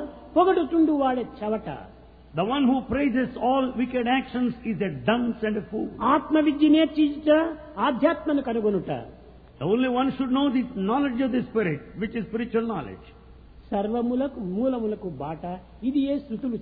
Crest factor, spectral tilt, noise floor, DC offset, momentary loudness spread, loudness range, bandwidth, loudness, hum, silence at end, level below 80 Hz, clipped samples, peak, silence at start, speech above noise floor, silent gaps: 16 dB; -10 dB/octave; -48 dBFS; under 0.1%; 11 LU; 6 LU; 4.8 kHz; -25 LUFS; none; 0 s; -52 dBFS; under 0.1%; -8 dBFS; 0 s; 24 dB; none